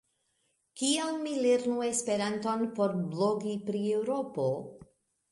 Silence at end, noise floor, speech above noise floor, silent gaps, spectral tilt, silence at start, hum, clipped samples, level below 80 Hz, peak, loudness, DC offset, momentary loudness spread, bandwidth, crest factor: 0.45 s; -76 dBFS; 46 dB; none; -4.5 dB/octave; 0.75 s; none; under 0.1%; -74 dBFS; -16 dBFS; -31 LUFS; under 0.1%; 6 LU; 11.5 kHz; 16 dB